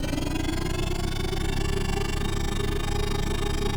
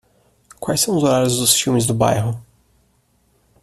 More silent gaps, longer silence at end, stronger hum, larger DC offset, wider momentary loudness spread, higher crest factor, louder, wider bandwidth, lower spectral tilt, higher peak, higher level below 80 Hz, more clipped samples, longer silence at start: neither; second, 0 s vs 1.2 s; neither; neither; second, 1 LU vs 11 LU; second, 14 dB vs 20 dB; second, -29 LUFS vs -17 LUFS; first, over 20 kHz vs 14.5 kHz; about the same, -5 dB/octave vs -4 dB/octave; second, -12 dBFS vs 0 dBFS; first, -28 dBFS vs -50 dBFS; neither; second, 0 s vs 0.6 s